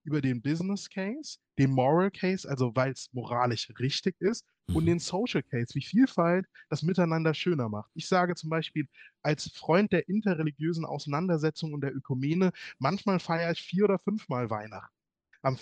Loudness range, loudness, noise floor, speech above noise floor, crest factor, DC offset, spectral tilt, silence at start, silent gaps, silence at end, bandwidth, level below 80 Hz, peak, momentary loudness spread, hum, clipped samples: 2 LU; -29 LUFS; -56 dBFS; 27 dB; 18 dB; under 0.1%; -6.5 dB/octave; 0.05 s; none; 0 s; 9.8 kHz; -60 dBFS; -10 dBFS; 9 LU; none; under 0.1%